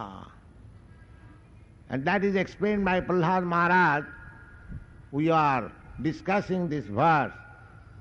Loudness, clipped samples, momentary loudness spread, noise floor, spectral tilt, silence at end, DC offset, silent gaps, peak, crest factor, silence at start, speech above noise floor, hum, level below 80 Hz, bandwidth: -26 LUFS; under 0.1%; 22 LU; -52 dBFS; -7.5 dB/octave; 0 s; under 0.1%; none; -12 dBFS; 16 dB; 0 s; 26 dB; none; -52 dBFS; 7.6 kHz